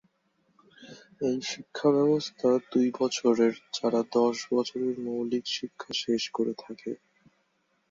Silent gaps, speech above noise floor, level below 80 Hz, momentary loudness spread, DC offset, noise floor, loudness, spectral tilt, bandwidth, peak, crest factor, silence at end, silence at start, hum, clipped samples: none; 45 dB; -74 dBFS; 10 LU; under 0.1%; -73 dBFS; -28 LUFS; -4.5 dB/octave; 7.8 kHz; -12 dBFS; 18 dB; 0.95 s; 0.8 s; none; under 0.1%